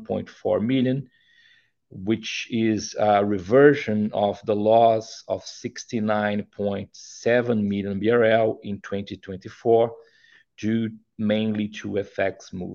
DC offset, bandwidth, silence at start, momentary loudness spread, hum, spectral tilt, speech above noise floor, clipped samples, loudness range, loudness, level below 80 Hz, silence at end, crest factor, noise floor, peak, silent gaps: under 0.1%; 7.2 kHz; 0 s; 14 LU; none; -6 dB/octave; 37 dB; under 0.1%; 5 LU; -23 LUFS; -64 dBFS; 0 s; 20 dB; -60 dBFS; -2 dBFS; none